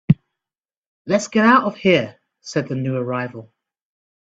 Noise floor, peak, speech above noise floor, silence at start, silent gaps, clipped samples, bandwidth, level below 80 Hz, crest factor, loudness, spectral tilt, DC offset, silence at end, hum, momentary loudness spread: under -90 dBFS; 0 dBFS; over 72 dB; 0.1 s; 0.78-1.05 s; under 0.1%; 8 kHz; -54 dBFS; 20 dB; -19 LUFS; -6 dB/octave; under 0.1%; 0.9 s; none; 19 LU